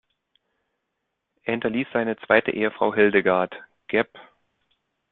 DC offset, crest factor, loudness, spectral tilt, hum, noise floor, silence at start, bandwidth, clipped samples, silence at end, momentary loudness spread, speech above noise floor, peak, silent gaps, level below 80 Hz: under 0.1%; 22 dB; -23 LUFS; -9.5 dB/octave; none; -79 dBFS; 1.45 s; 4.2 kHz; under 0.1%; 0.9 s; 12 LU; 57 dB; -4 dBFS; none; -64 dBFS